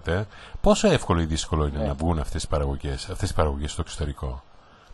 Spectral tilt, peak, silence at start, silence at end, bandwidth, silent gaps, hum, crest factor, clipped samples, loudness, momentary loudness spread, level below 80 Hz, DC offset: -5.5 dB/octave; -6 dBFS; 0 s; 0 s; 12 kHz; none; none; 18 dB; under 0.1%; -26 LUFS; 11 LU; -32 dBFS; under 0.1%